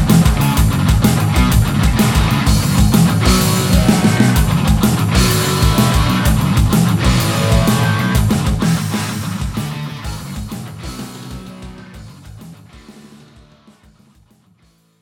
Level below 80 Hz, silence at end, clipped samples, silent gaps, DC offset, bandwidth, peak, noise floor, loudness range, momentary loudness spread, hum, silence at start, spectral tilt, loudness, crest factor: -22 dBFS; 2.1 s; under 0.1%; none; under 0.1%; 19.5 kHz; 0 dBFS; -54 dBFS; 17 LU; 16 LU; none; 0 s; -5.5 dB/octave; -14 LUFS; 14 dB